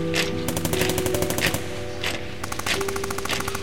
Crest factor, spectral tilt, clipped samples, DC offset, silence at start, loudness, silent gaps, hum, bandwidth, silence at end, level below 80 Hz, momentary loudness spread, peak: 20 dB; -3.5 dB/octave; under 0.1%; 2%; 0 s; -25 LUFS; none; none; 17 kHz; 0 s; -42 dBFS; 6 LU; -6 dBFS